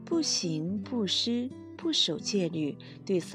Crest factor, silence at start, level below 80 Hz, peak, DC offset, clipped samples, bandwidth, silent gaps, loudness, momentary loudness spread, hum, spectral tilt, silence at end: 16 dB; 0 s; -74 dBFS; -14 dBFS; under 0.1%; under 0.1%; 12.5 kHz; none; -30 LUFS; 10 LU; none; -4 dB/octave; 0 s